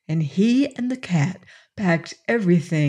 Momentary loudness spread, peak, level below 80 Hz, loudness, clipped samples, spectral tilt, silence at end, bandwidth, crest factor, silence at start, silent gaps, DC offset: 8 LU; -6 dBFS; -64 dBFS; -22 LUFS; under 0.1%; -7 dB/octave; 0 s; 10 kHz; 14 dB; 0.1 s; none; under 0.1%